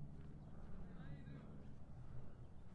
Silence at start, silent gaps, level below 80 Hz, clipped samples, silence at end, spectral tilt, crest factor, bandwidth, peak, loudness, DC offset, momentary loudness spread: 0 s; none; -60 dBFS; under 0.1%; 0 s; -8.5 dB/octave; 12 dB; 5.4 kHz; -40 dBFS; -58 LUFS; under 0.1%; 4 LU